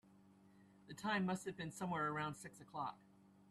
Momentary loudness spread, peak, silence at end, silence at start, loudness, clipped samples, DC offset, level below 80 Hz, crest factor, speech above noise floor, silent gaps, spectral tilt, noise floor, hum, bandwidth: 14 LU; -28 dBFS; 0.1 s; 0.1 s; -44 LUFS; under 0.1%; under 0.1%; -78 dBFS; 18 dB; 24 dB; none; -5 dB/octave; -67 dBFS; none; 13 kHz